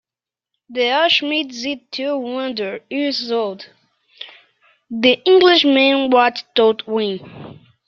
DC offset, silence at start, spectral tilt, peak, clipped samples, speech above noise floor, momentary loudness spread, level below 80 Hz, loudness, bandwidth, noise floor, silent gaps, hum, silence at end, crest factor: under 0.1%; 0.7 s; -4 dB/octave; 0 dBFS; under 0.1%; 72 dB; 22 LU; -66 dBFS; -16 LUFS; 7 kHz; -89 dBFS; none; none; 0.35 s; 18 dB